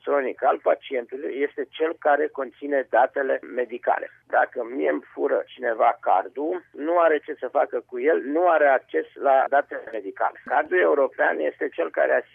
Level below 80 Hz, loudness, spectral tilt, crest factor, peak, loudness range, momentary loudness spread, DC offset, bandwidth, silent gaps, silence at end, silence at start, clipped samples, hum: -78 dBFS; -23 LUFS; -6.5 dB/octave; 16 dB; -6 dBFS; 3 LU; 9 LU; under 0.1%; 3.7 kHz; none; 0.15 s; 0.05 s; under 0.1%; none